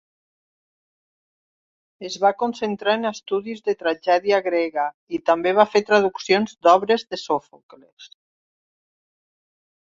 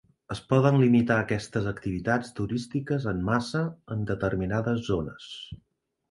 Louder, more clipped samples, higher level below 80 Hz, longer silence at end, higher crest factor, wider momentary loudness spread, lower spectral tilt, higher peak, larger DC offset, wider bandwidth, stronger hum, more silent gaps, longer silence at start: first, -21 LUFS vs -27 LUFS; neither; second, -70 dBFS vs -50 dBFS; first, 1.85 s vs 0.55 s; about the same, 22 dB vs 20 dB; second, 9 LU vs 17 LU; second, -4.5 dB/octave vs -7 dB/octave; first, -2 dBFS vs -6 dBFS; neither; second, 7.6 kHz vs 11.5 kHz; neither; first, 4.94-5.07 s, 7.63-7.69 s, 7.92-7.97 s vs none; first, 2 s vs 0.3 s